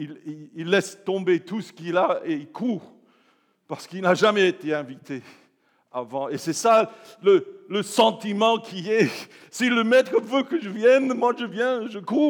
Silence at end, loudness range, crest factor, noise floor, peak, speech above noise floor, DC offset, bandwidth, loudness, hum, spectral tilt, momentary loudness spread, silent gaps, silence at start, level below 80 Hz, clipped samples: 0 s; 4 LU; 20 dB; -64 dBFS; -4 dBFS; 41 dB; under 0.1%; 19.5 kHz; -23 LUFS; none; -4.5 dB/octave; 16 LU; none; 0 s; under -90 dBFS; under 0.1%